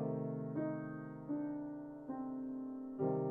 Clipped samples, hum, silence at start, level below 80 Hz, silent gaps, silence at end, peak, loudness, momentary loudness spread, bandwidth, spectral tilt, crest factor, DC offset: under 0.1%; none; 0 s; -74 dBFS; none; 0 s; -24 dBFS; -43 LUFS; 7 LU; 2.6 kHz; -11.5 dB/octave; 16 dB; under 0.1%